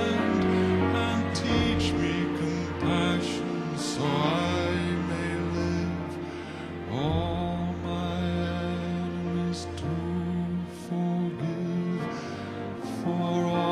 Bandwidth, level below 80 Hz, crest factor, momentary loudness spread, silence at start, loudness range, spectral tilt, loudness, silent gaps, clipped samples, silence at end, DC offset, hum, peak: 12 kHz; -46 dBFS; 16 dB; 9 LU; 0 s; 4 LU; -6 dB/octave; -29 LUFS; none; under 0.1%; 0 s; under 0.1%; none; -12 dBFS